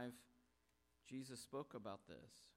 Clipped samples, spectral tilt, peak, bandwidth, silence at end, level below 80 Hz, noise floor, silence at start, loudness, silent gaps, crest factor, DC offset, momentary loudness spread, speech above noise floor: under 0.1%; -5 dB/octave; -38 dBFS; 16 kHz; 0.05 s; -84 dBFS; -82 dBFS; 0 s; -54 LUFS; none; 18 dB; under 0.1%; 10 LU; 28 dB